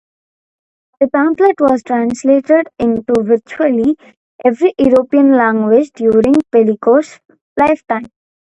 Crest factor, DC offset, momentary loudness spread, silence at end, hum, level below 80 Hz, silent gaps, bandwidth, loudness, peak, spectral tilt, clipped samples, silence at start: 12 dB; under 0.1%; 7 LU; 0.45 s; none; -50 dBFS; 4.17-4.39 s, 7.41-7.56 s; 8.6 kHz; -13 LUFS; 0 dBFS; -7 dB/octave; under 0.1%; 1 s